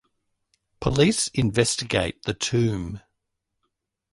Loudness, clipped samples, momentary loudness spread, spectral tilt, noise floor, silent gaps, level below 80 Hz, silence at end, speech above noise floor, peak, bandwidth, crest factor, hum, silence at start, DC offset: -23 LUFS; under 0.1%; 11 LU; -4.5 dB/octave; -79 dBFS; none; -46 dBFS; 1.15 s; 56 dB; -6 dBFS; 11.5 kHz; 20 dB; none; 0.8 s; under 0.1%